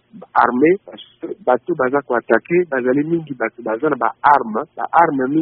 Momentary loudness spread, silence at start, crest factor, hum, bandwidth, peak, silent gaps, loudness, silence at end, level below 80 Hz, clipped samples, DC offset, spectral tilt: 10 LU; 0.15 s; 18 dB; none; 4.5 kHz; 0 dBFS; none; -17 LUFS; 0 s; -60 dBFS; under 0.1%; under 0.1%; -5.5 dB/octave